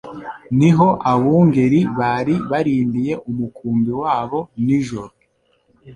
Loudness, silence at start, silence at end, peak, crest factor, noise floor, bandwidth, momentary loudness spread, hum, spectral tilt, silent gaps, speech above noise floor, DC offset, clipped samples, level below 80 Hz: -17 LUFS; 0.05 s; 0 s; -2 dBFS; 16 dB; -62 dBFS; 9.4 kHz; 11 LU; none; -8.5 dB/octave; none; 45 dB; under 0.1%; under 0.1%; -50 dBFS